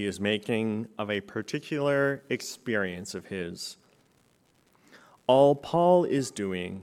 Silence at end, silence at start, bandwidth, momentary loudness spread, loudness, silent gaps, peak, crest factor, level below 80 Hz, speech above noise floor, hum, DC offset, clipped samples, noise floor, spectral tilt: 0 s; 0 s; 15 kHz; 14 LU; -27 LUFS; none; -8 dBFS; 20 dB; -68 dBFS; 39 dB; none; under 0.1%; under 0.1%; -66 dBFS; -5.5 dB/octave